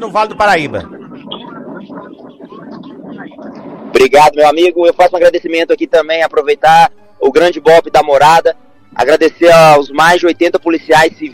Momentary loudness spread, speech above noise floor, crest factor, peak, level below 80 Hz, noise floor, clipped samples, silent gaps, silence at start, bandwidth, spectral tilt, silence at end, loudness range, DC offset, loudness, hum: 23 LU; 24 dB; 10 dB; 0 dBFS; -44 dBFS; -32 dBFS; 0.2%; none; 0 s; 16 kHz; -4.5 dB/octave; 0.05 s; 11 LU; under 0.1%; -9 LUFS; none